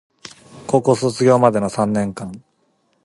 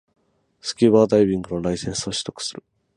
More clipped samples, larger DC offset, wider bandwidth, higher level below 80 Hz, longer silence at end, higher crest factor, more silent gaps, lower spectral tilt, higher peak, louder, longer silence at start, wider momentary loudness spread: neither; neither; about the same, 11.5 kHz vs 11.5 kHz; about the same, -54 dBFS vs -50 dBFS; first, 0.65 s vs 0.45 s; about the same, 18 dB vs 18 dB; neither; first, -6.5 dB/octave vs -5 dB/octave; first, 0 dBFS vs -4 dBFS; first, -17 LUFS vs -21 LUFS; second, 0.25 s vs 0.65 s; first, 20 LU vs 15 LU